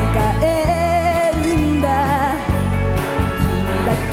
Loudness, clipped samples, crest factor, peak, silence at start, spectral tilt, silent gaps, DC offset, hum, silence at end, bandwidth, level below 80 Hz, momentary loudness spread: -18 LUFS; under 0.1%; 12 dB; -4 dBFS; 0 s; -6.5 dB/octave; none; under 0.1%; none; 0 s; 16.5 kHz; -26 dBFS; 3 LU